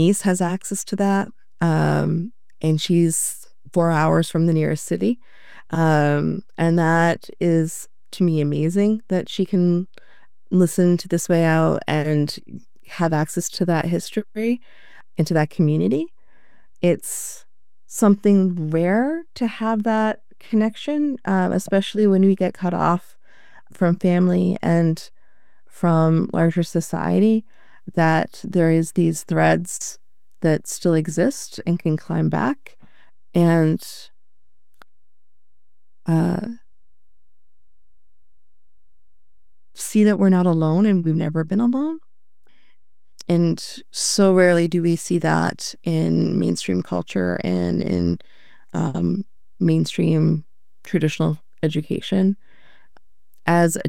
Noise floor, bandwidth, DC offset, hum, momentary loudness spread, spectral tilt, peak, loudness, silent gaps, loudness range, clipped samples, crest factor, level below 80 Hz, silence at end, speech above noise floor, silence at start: -82 dBFS; 15.5 kHz; 1%; none; 10 LU; -6 dB/octave; -4 dBFS; -20 LUFS; none; 4 LU; under 0.1%; 18 dB; -60 dBFS; 0 s; 63 dB; 0 s